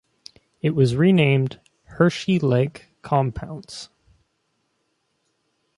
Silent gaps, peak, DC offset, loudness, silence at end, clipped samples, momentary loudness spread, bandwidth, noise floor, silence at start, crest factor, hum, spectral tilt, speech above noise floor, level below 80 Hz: none; -4 dBFS; under 0.1%; -20 LUFS; 1.9 s; under 0.1%; 20 LU; 11.5 kHz; -71 dBFS; 0.65 s; 20 dB; none; -7.5 dB/octave; 52 dB; -52 dBFS